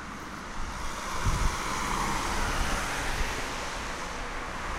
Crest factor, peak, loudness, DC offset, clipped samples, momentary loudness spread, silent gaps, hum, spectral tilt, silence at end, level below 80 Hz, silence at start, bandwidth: 16 dB; -14 dBFS; -32 LUFS; under 0.1%; under 0.1%; 8 LU; none; none; -3 dB/octave; 0 s; -36 dBFS; 0 s; 16 kHz